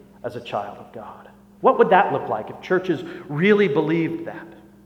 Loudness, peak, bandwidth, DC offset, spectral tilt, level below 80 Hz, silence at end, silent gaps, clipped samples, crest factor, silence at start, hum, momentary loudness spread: -21 LUFS; -2 dBFS; 8 kHz; under 0.1%; -7.5 dB/octave; -62 dBFS; 0.3 s; none; under 0.1%; 20 dB; 0.25 s; none; 22 LU